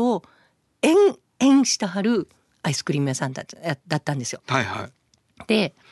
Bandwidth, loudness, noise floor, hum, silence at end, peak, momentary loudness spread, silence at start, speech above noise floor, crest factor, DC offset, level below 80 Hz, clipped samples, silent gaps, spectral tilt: 12.5 kHz; -22 LUFS; -62 dBFS; none; 0.2 s; -4 dBFS; 13 LU; 0 s; 40 dB; 18 dB; under 0.1%; -62 dBFS; under 0.1%; none; -4.5 dB/octave